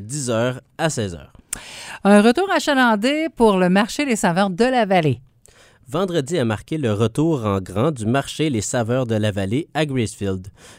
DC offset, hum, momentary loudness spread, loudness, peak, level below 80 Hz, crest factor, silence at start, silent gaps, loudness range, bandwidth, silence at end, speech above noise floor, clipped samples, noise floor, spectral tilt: under 0.1%; none; 11 LU; -19 LUFS; 0 dBFS; -50 dBFS; 20 dB; 0 s; none; 5 LU; 16 kHz; 0.05 s; 32 dB; under 0.1%; -51 dBFS; -5.5 dB/octave